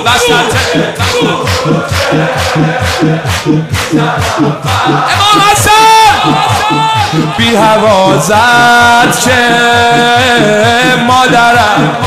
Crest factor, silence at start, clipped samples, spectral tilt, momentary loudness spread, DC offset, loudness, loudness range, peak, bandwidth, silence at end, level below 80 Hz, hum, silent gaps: 8 dB; 0 s; under 0.1%; -4 dB/octave; 7 LU; under 0.1%; -7 LUFS; 5 LU; 0 dBFS; 16 kHz; 0 s; -36 dBFS; none; none